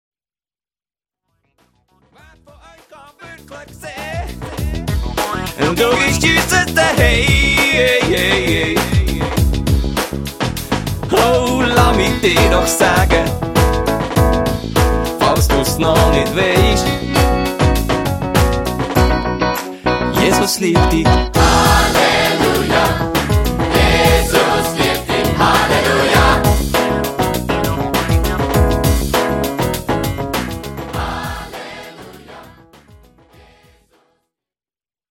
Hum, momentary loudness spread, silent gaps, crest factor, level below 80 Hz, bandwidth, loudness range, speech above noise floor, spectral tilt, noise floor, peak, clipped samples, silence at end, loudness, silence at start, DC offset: none; 11 LU; none; 14 dB; -22 dBFS; 17 kHz; 11 LU; over 77 dB; -4.5 dB/octave; under -90 dBFS; 0 dBFS; under 0.1%; 2.65 s; -14 LUFS; 2.9 s; under 0.1%